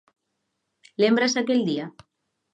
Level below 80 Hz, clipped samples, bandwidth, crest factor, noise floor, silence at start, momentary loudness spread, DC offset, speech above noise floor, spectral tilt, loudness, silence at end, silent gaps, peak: -74 dBFS; under 0.1%; 9.2 kHz; 18 dB; -78 dBFS; 1 s; 18 LU; under 0.1%; 56 dB; -4.5 dB/octave; -22 LUFS; 0.65 s; none; -8 dBFS